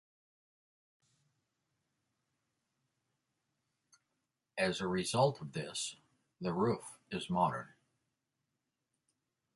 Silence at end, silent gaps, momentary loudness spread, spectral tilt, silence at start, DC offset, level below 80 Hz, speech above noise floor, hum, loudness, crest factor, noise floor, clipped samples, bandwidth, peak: 1.9 s; none; 12 LU; -4.5 dB/octave; 4.55 s; under 0.1%; -72 dBFS; 52 dB; none; -36 LUFS; 22 dB; -87 dBFS; under 0.1%; 11.5 kHz; -18 dBFS